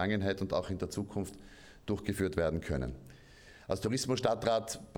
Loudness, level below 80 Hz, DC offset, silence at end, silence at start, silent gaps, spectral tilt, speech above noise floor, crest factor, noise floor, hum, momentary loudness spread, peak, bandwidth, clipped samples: -34 LUFS; -52 dBFS; under 0.1%; 0 s; 0 s; none; -5.5 dB/octave; 22 dB; 22 dB; -56 dBFS; none; 15 LU; -14 dBFS; 20 kHz; under 0.1%